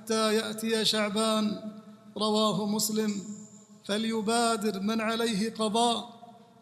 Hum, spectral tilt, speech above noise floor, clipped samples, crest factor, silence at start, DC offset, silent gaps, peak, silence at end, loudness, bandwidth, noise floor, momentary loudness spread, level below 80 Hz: none; -3.5 dB/octave; 22 dB; under 0.1%; 18 dB; 0 s; under 0.1%; none; -12 dBFS; 0.25 s; -28 LUFS; 15 kHz; -49 dBFS; 17 LU; -74 dBFS